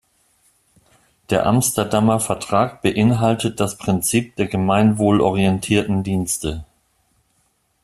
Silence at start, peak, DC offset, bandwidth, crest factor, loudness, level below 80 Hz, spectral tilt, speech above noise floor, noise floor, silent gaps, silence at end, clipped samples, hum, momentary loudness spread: 1.3 s; -2 dBFS; under 0.1%; 15 kHz; 18 dB; -18 LUFS; -46 dBFS; -5.5 dB/octave; 47 dB; -65 dBFS; none; 1.2 s; under 0.1%; none; 6 LU